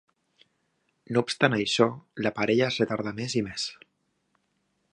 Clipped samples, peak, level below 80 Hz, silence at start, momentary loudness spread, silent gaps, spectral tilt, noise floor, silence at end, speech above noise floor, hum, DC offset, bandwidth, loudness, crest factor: under 0.1%; -6 dBFS; -64 dBFS; 1.1 s; 8 LU; none; -4.5 dB/octave; -74 dBFS; 1.2 s; 48 dB; none; under 0.1%; 11 kHz; -27 LUFS; 24 dB